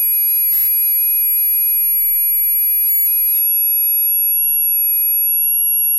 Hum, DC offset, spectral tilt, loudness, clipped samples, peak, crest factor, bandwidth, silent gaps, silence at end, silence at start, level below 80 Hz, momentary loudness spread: none; 0.7%; 4.5 dB/octave; -11 LUFS; under 0.1%; -8 dBFS; 8 dB; 16.5 kHz; none; 0 s; 0 s; -64 dBFS; 1 LU